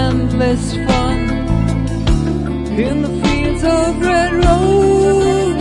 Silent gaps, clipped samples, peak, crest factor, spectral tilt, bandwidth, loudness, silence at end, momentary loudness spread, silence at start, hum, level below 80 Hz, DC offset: none; under 0.1%; 0 dBFS; 12 dB; -6.5 dB/octave; 11.5 kHz; -15 LUFS; 0 s; 6 LU; 0 s; none; -22 dBFS; under 0.1%